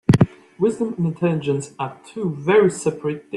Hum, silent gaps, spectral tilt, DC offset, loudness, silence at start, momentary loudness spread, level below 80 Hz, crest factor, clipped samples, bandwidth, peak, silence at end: none; none; -7 dB/octave; under 0.1%; -21 LUFS; 0.1 s; 12 LU; -48 dBFS; 18 dB; under 0.1%; 12 kHz; -2 dBFS; 0 s